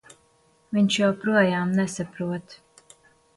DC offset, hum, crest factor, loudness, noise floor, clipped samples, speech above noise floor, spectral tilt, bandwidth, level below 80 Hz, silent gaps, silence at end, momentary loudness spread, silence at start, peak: under 0.1%; none; 18 dB; -24 LUFS; -62 dBFS; under 0.1%; 39 dB; -5.5 dB/octave; 11.5 kHz; -66 dBFS; none; 0.8 s; 10 LU; 0.7 s; -8 dBFS